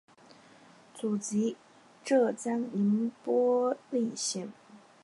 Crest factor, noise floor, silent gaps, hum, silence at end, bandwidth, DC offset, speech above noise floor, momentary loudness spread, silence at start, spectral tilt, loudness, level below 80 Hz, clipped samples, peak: 18 dB; -57 dBFS; none; none; 0.25 s; 11.5 kHz; under 0.1%; 28 dB; 11 LU; 0.95 s; -5 dB/octave; -30 LUFS; -84 dBFS; under 0.1%; -14 dBFS